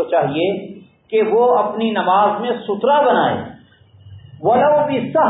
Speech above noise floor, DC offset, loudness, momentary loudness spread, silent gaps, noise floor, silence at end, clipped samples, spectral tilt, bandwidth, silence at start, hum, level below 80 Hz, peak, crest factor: 32 dB; under 0.1%; -16 LUFS; 9 LU; none; -47 dBFS; 0 s; under 0.1%; -11 dB/octave; 4 kHz; 0 s; none; -56 dBFS; -4 dBFS; 14 dB